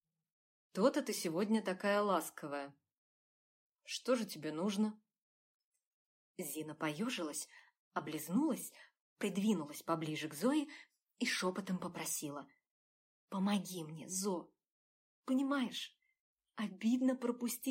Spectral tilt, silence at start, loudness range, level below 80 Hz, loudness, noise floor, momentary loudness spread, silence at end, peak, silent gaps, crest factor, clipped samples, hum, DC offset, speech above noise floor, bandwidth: -4.5 dB/octave; 0.75 s; 4 LU; under -90 dBFS; -38 LUFS; under -90 dBFS; 12 LU; 0 s; -18 dBFS; 2.98-3.75 s, 5.22-5.72 s, 5.87-6.34 s, 7.79-7.91 s, 9.01-9.16 s, 12.71-13.28 s, 14.72-15.22 s, 16.20-16.35 s; 20 dB; under 0.1%; none; under 0.1%; over 52 dB; 16 kHz